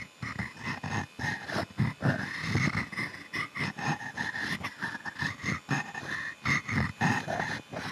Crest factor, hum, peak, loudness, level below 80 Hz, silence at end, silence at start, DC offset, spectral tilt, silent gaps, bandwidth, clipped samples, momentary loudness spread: 18 dB; none; -14 dBFS; -32 LUFS; -56 dBFS; 0 s; 0 s; under 0.1%; -5 dB/octave; none; 13.5 kHz; under 0.1%; 7 LU